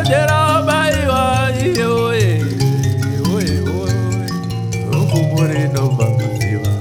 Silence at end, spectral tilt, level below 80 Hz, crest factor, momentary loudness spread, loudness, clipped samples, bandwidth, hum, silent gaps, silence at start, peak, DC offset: 0 s; -6 dB/octave; -36 dBFS; 14 dB; 5 LU; -16 LUFS; under 0.1%; 17.5 kHz; none; none; 0 s; -2 dBFS; under 0.1%